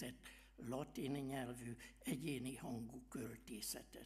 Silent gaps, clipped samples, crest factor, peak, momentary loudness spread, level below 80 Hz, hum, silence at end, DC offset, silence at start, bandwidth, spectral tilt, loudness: none; under 0.1%; 18 dB; -32 dBFS; 8 LU; -68 dBFS; none; 0 s; under 0.1%; 0 s; 15.5 kHz; -4.5 dB/octave; -48 LUFS